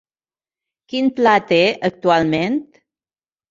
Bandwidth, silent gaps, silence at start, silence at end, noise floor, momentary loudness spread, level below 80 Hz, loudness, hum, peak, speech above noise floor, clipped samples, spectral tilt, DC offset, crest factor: 7.6 kHz; none; 0.9 s; 0.85 s; under -90 dBFS; 8 LU; -58 dBFS; -17 LUFS; none; -2 dBFS; over 74 dB; under 0.1%; -6 dB/octave; under 0.1%; 18 dB